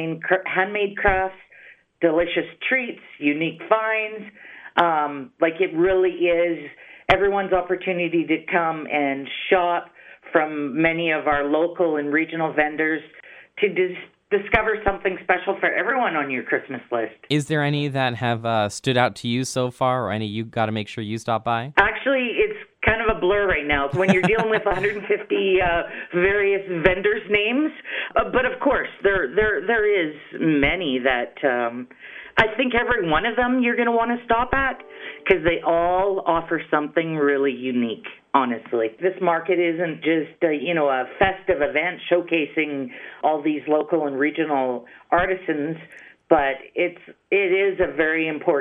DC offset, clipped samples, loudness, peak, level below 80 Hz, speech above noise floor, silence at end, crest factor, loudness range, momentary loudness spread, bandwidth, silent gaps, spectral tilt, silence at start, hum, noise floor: under 0.1%; under 0.1%; -22 LUFS; -2 dBFS; -44 dBFS; 28 dB; 0 s; 20 dB; 3 LU; 7 LU; 11.5 kHz; none; -6 dB/octave; 0 s; none; -49 dBFS